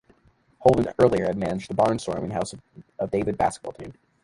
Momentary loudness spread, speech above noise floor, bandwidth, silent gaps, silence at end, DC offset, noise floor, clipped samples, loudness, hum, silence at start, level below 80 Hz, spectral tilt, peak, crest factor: 17 LU; 37 dB; 11.5 kHz; none; 0.3 s; under 0.1%; -61 dBFS; under 0.1%; -24 LUFS; none; 0.6 s; -50 dBFS; -6.5 dB/octave; -2 dBFS; 22 dB